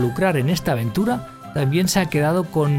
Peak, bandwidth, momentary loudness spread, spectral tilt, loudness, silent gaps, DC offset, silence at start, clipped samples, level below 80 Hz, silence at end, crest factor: -4 dBFS; 16.5 kHz; 5 LU; -6 dB/octave; -20 LUFS; none; under 0.1%; 0 s; under 0.1%; -46 dBFS; 0 s; 14 dB